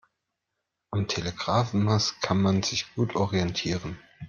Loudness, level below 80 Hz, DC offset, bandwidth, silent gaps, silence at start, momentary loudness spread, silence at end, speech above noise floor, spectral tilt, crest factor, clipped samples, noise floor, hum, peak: -27 LUFS; -56 dBFS; under 0.1%; 7.2 kHz; none; 0.9 s; 7 LU; 0 s; 57 dB; -5 dB/octave; 20 dB; under 0.1%; -83 dBFS; none; -8 dBFS